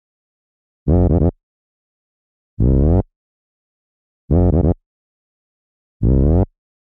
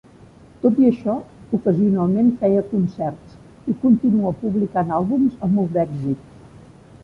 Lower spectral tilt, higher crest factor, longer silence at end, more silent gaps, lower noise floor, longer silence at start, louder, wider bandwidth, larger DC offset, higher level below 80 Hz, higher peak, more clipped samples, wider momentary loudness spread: first, -14 dB/octave vs -11 dB/octave; about the same, 16 dB vs 16 dB; second, 0.4 s vs 0.8 s; first, 1.43-2.57 s, 3.16-4.28 s, 4.86-6.00 s vs none; first, under -90 dBFS vs -46 dBFS; first, 0.85 s vs 0.65 s; first, -17 LUFS vs -20 LUFS; second, 2 kHz vs 5.6 kHz; neither; first, -24 dBFS vs -52 dBFS; about the same, -4 dBFS vs -4 dBFS; neither; about the same, 10 LU vs 11 LU